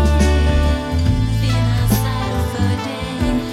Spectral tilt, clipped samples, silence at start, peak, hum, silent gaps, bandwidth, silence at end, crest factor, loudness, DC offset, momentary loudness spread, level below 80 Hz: -6 dB/octave; under 0.1%; 0 s; -2 dBFS; none; none; 15.5 kHz; 0 s; 14 dB; -18 LUFS; under 0.1%; 6 LU; -20 dBFS